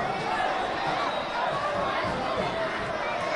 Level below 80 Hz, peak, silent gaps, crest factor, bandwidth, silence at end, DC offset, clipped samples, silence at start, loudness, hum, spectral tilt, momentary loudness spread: -52 dBFS; -16 dBFS; none; 14 dB; 11.5 kHz; 0 s; under 0.1%; under 0.1%; 0 s; -28 LUFS; none; -4.5 dB/octave; 2 LU